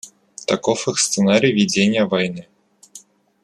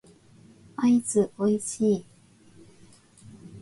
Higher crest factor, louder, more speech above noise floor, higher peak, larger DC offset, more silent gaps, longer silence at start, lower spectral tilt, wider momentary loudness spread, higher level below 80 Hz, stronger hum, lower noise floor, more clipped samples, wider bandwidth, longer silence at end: about the same, 16 dB vs 16 dB; first, -18 LUFS vs -25 LUFS; second, 28 dB vs 32 dB; first, -2 dBFS vs -12 dBFS; neither; neither; second, 0.05 s vs 0.8 s; second, -4 dB/octave vs -6 dB/octave; about the same, 13 LU vs 13 LU; about the same, -62 dBFS vs -66 dBFS; neither; second, -46 dBFS vs -56 dBFS; neither; about the same, 12.5 kHz vs 11.5 kHz; first, 0.45 s vs 0 s